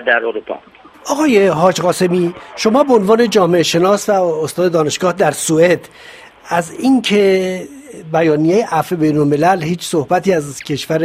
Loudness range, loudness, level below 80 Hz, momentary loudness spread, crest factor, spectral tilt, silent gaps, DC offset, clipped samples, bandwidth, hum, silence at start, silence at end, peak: 3 LU; -14 LUFS; -54 dBFS; 10 LU; 14 dB; -5 dB/octave; none; under 0.1%; under 0.1%; 16 kHz; none; 0 s; 0 s; 0 dBFS